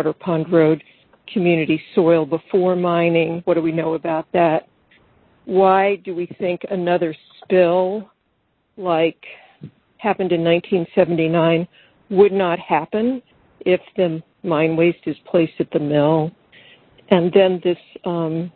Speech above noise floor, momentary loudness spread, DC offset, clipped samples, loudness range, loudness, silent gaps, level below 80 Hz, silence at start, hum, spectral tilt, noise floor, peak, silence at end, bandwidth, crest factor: 49 dB; 10 LU; under 0.1%; under 0.1%; 3 LU; -19 LUFS; none; -60 dBFS; 0 s; none; -11 dB/octave; -66 dBFS; 0 dBFS; 0.05 s; 4.4 kHz; 18 dB